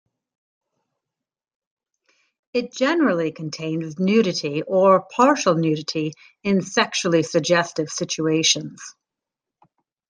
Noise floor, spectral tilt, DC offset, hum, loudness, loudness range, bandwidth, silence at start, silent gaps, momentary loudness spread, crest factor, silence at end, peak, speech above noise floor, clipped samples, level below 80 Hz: -87 dBFS; -4 dB/octave; under 0.1%; none; -21 LUFS; 6 LU; 10.5 kHz; 2.55 s; none; 11 LU; 20 dB; 1.2 s; -2 dBFS; 67 dB; under 0.1%; -70 dBFS